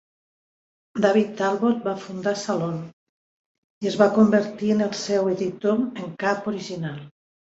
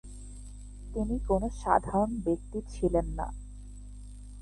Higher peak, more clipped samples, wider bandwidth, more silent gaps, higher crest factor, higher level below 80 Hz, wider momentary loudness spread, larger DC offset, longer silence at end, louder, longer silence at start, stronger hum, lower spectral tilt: first, -4 dBFS vs -8 dBFS; neither; second, 8 kHz vs 11.5 kHz; first, 2.93-3.81 s vs none; about the same, 20 dB vs 24 dB; second, -66 dBFS vs -40 dBFS; second, 12 LU vs 20 LU; neither; first, 0.5 s vs 0 s; first, -23 LUFS vs -31 LUFS; first, 0.95 s vs 0.05 s; second, none vs 50 Hz at -40 dBFS; second, -6 dB/octave vs -7.5 dB/octave